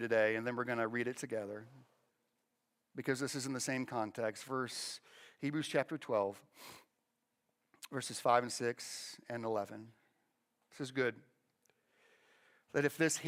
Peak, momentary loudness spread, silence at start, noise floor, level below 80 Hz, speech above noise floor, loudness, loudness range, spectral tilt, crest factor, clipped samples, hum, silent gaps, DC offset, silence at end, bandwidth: -16 dBFS; 15 LU; 0 s; -85 dBFS; -86 dBFS; 47 dB; -38 LUFS; 4 LU; -4 dB/octave; 22 dB; under 0.1%; none; none; under 0.1%; 0 s; 16.5 kHz